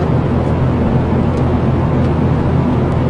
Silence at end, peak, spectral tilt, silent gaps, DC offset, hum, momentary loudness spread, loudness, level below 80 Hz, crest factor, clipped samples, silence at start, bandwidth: 0 s; -2 dBFS; -9.5 dB/octave; none; under 0.1%; none; 1 LU; -14 LUFS; -28 dBFS; 10 dB; under 0.1%; 0 s; 6.8 kHz